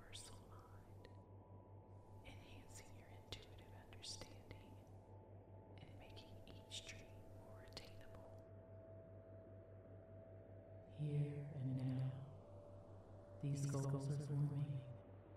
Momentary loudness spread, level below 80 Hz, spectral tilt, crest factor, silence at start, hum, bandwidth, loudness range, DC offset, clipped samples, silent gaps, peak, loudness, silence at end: 18 LU; -70 dBFS; -6.5 dB/octave; 22 dB; 0 s; none; 13 kHz; 13 LU; under 0.1%; under 0.1%; none; -30 dBFS; -51 LUFS; 0 s